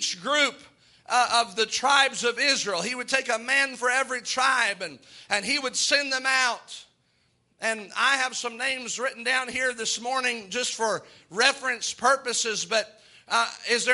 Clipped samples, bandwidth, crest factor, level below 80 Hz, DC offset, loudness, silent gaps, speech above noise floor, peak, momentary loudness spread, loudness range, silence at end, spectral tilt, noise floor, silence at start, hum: under 0.1%; 11.5 kHz; 24 dB; -72 dBFS; under 0.1%; -24 LUFS; none; 42 dB; -2 dBFS; 7 LU; 4 LU; 0 s; 0 dB/octave; -68 dBFS; 0 s; none